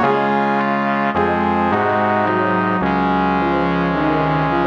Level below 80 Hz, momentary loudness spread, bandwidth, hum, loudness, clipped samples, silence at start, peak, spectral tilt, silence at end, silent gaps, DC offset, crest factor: -40 dBFS; 1 LU; 7.2 kHz; none; -17 LUFS; under 0.1%; 0 s; -2 dBFS; -8 dB/octave; 0 s; none; under 0.1%; 14 dB